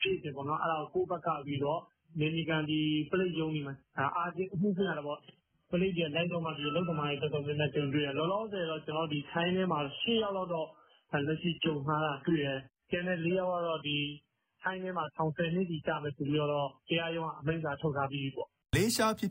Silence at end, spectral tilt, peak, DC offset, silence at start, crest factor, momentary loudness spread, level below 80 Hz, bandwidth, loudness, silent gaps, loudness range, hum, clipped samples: 0 s; -4.5 dB/octave; -16 dBFS; under 0.1%; 0 s; 18 dB; 6 LU; -62 dBFS; 5.6 kHz; -33 LUFS; none; 2 LU; none; under 0.1%